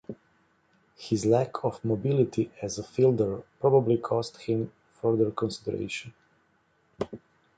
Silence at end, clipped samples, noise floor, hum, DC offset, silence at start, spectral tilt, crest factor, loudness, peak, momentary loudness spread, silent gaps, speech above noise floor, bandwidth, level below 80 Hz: 0.4 s; under 0.1%; -68 dBFS; none; under 0.1%; 0.1 s; -7 dB/octave; 20 dB; -28 LUFS; -8 dBFS; 14 LU; none; 41 dB; 9.2 kHz; -60 dBFS